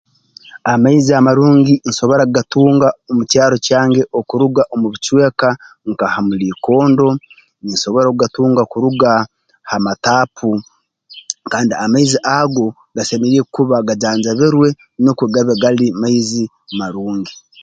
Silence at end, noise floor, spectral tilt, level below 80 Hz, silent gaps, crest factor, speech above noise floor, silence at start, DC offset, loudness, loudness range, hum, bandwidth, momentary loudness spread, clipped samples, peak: 0.3 s; -42 dBFS; -5.5 dB/octave; -54 dBFS; none; 14 dB; 29 dB; 0.55 s; under 0.1%; -14 LUFS; 4 LU; none; 9.2 kHz; 11 LU; under 0.1%; 0 dBFS